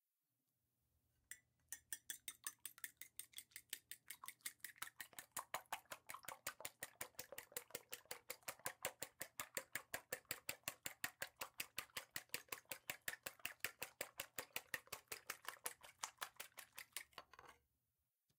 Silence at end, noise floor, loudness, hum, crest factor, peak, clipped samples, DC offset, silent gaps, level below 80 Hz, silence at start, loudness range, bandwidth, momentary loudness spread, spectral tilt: 0.8 s; under -90 dBFS; -51 LUFS; none; 32 dB; -22 dBFS; under 0.1%; under 0.1%; none; -86 dBFS; 1.3 s; 4 LU; 18 kHz; 7 LU; 0 dB/octave